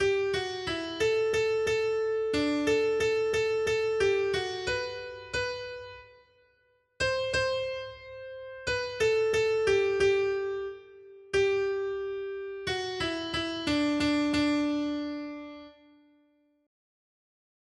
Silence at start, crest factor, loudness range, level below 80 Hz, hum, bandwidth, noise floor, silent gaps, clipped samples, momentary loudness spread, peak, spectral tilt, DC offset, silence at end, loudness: 0 s; 16 dB; 6 LU; -56 dBFS; none; 12 kHz; -69 dBFS; none; under 0.1%; 14 LU; -14 dBFS; -4 dB/octave; under 0.1%; 1.95 s; -29 LUFS